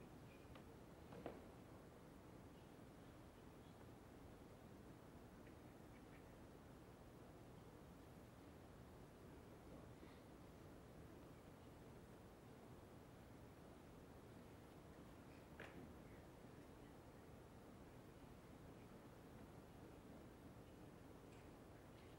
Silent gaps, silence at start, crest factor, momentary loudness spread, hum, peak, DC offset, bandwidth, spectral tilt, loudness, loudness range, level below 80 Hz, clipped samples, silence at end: none; 0 s; 24 dB; 2 LU; none; -36 dBFS; under 0.1%; 16 kHz; -6 dB/octave; -63 LUFS; 1 LU; -72 dBFS; under 0.1%; 0 s